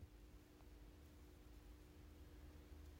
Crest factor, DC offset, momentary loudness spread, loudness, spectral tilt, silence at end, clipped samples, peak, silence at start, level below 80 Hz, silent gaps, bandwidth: 12 dB; under 0.1%; 3 LU; -64 LUFS; -6 dB/octave; 0 s; under 0.1%; -48 dBFS; 0 s; -64 dBFS; none; 16 kHz